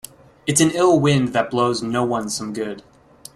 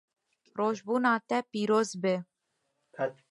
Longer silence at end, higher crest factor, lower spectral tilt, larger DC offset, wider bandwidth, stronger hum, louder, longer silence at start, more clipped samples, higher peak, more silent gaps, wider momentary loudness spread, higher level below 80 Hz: first, 0.55 s vs 0.2 s; about the same, 20 dB vs 18 dB; about the same, -4.5 dB/octave vs -5 dB/octave; neither; first, 16 kHz vs 11.5 kHz; neither; first, -19 LUFS vs -30 LUFS; about the same, 0.45 s vs 0.55 s; neither; first, -2 dBFS vs -12 dBFS; neither; first, 14 LU vs 9 LU; first, -54 dBFS vs -82 dBFS